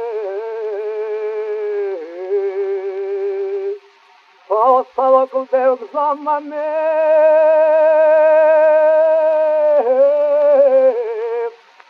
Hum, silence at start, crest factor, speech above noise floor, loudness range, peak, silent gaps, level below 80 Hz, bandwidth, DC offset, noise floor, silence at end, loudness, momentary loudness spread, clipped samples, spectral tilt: none; 0 s; 14 dB; 36 dB; 10 LU; -2 dBFS; none; -80 dBFS; 5 kHz; under 0.1%; -49 dBFS; 0.4 s; -15 LUFS; 12 LU; under 0.1%; -4.5 dB/octave